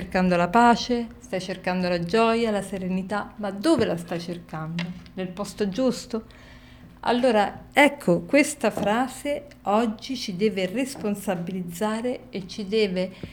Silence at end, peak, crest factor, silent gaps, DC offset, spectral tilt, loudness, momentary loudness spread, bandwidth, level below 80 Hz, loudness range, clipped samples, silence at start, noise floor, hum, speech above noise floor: 0 s; -4 dBFS; 20 dB; none; under 0.1%; -5 dB/octave; -25 LUFS; 13 LU; 19.5 kHz; -52 dBFS; 5 LU; under 0.1%; 0 s; -47 dBFS; none; 23 dB